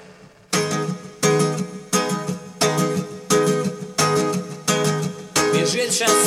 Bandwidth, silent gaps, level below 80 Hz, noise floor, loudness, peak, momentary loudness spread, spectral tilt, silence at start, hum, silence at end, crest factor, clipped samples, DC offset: 16.5 kHz; none; -58 dBFS; -46 dBFS; -21 LUFS; -4 dBFS; 7 LU; -3.5 dB/octave; 0 s; none; 0 s; 16 dB; under 0.1%; under 0.1%